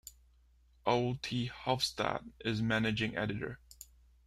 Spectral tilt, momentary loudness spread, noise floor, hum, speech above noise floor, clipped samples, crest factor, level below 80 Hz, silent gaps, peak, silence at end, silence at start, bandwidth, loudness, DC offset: -5 dB/octave; 21 LU; -66 dBFS; none; 32 dB; under 0.1%; 22 dB; -60 dBFS; none; -14 dBFS; 0.45 s; 0.05 s; 15.5 kHz; -35 LUFS; under 0.1%